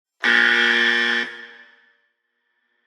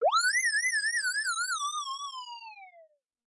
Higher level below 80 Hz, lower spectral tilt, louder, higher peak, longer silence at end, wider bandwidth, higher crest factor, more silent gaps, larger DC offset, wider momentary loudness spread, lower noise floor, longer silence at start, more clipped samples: first, -80 dBFS vs under -90 dBFS; first, -1 dB/octave vs 5 dB/octave; first, -16 LUFS vs -28 LUFS; first, -2 dBFS vs -18 dBFS; first, 1.4 s vs 0.45 s; about the same, 11 kHz vs 11.5 kHz; first, 20 dB vs 14 dB; neither; neither; second, 14 LU vs 18 LU; first, -72 dBFS vs -60 dBFS; first, 0.2 s vs 0 s; neither